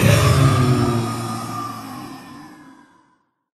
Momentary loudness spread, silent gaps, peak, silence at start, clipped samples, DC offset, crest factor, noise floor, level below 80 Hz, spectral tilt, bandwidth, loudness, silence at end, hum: 23 LU; none; 0 dBFS; 0 s; under 0.1%; under 0.1%; 20 dB; -63 dBFS; -38 dBFS; -6 dB/octave; 14 kHz; -18 LUFS; 1 s; none